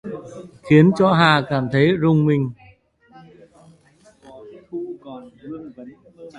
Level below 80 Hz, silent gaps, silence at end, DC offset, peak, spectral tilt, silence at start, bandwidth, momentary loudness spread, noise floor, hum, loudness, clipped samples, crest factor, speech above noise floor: -56 dBFS; none; 0 s; under 0.1%; 0 dBFS; -7.5 dB/octave; 0.05 s; 10 kHz; 24 LU; -54 dBFS; none; -16 LUFS; under 0.1%; 20 dB; 37 dB